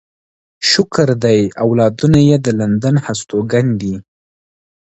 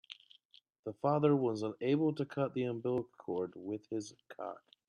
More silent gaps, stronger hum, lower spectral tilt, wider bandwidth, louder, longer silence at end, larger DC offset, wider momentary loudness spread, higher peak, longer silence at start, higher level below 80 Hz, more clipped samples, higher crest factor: second, none vs 0.45-0.50 s, 0.79-0.83 s; neither; second, -6 dB/octave vs -7.5 dB/octave; second, 8.2 kHz vs 10.5 kHz; first, -14 LUFS vs -36 LUFS; first, 0.85 s vs 0.3 s; neither; second, 8 LU vs 17 LU; first, 0 dBFS vs -16 dBFS; first, 0.6 s vs 0.1 s; first, -42 dBFS vs -78 dBFS; neither; second, 14 dB vs 20 dB